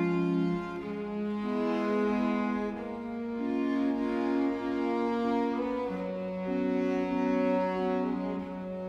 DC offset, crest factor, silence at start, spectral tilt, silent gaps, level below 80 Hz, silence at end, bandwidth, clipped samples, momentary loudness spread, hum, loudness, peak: under 0.1%; 14 dB; 0 s; -8 dB/octave; none; -60 dBFS; 0 s; 7.8 kHz; under 0.1%; 7 LU; none; -31 LUFS; -16 dBFS